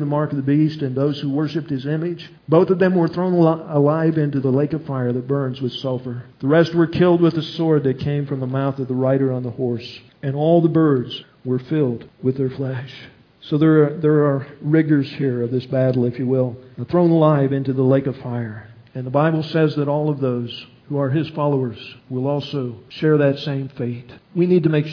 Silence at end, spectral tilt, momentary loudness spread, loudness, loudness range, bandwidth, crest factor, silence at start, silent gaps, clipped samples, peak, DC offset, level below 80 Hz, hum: 0 s; -9.5 dB/octave; 12 LU; -19 LUFS; 3 LU; 5.4 kHz; 16 dB; 0 s; none; under 0.1%; -2 dBFS; under 0.1%; -60 dBFS; none